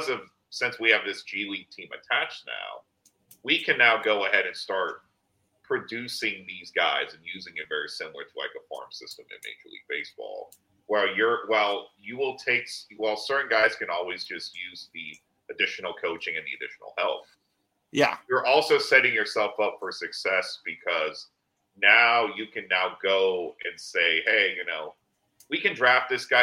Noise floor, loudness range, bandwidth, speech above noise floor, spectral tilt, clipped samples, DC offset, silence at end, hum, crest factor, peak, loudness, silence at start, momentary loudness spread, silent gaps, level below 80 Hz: -75 dBFS; 8 LU; 16 kHz; 48 dB; -2.5 dB/octave; under 0.1%; under 0.1%; 0 s; none; 24 dB; -2 dBFS; -25 LUFS; 0 s; 19 LU; none; -78 dBFS